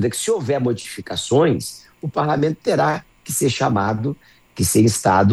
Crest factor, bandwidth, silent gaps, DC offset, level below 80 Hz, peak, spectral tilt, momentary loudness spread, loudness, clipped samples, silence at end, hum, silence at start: 16 dB; 13 kHz; none; under 0.1%; -50 dBFS; -4 dBFS; -5 dB/octave; 12 LU; -19 LUFS; under 0.1%; 0 s; none; 0 s